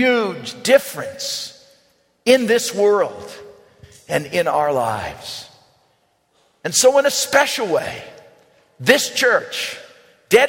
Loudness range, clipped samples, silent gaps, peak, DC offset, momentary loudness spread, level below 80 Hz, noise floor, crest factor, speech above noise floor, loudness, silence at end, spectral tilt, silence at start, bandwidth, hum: 6 LU; under 0.1%; none; 0 dBFS; under 0.1%; 16 LU; -58 dBFS; -62 dBFS; 20 dB; 45 dB; -18 LUFS; 0 s; -2.5 dB/octave; 0 s; 16.5 kHz; none